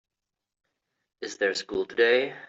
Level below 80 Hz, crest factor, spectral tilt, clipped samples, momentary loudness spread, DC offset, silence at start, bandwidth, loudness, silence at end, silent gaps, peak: -68 dBFS; 20 dB; -2.5 dB/octave; under 0.1%; 16 LU; under 0.1%; 1.2 s; 8 kHz; -25 LUFS; 0.05 s; none; -10 dBFS